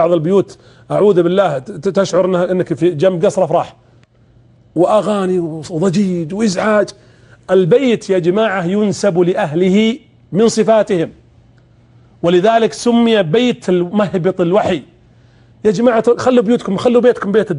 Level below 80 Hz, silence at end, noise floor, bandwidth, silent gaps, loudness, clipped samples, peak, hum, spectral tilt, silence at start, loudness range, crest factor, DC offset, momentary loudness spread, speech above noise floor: -52 dBFS; 0 s; -48 dBFS; 11 kHz; none; -14 LUFS; under 0.1%; -2 dBFS; none; -6 dB/octave; 0 s; 2 LU; 12 dB; under 0.1%; 7 LU; 35 dB